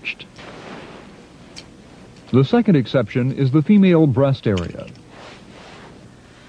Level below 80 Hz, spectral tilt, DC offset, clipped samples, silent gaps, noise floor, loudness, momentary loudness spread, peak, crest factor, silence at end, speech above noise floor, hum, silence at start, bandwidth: -52 dBFS; -8.5 dB/octave; under 0.1%; under 0.1%; none; -44 dBFS; -17 LUFS; 26 LU; -2 dBFS; 18 dB; 0.65 s; 28 dB; none; 0.05 s; 9.2 kHz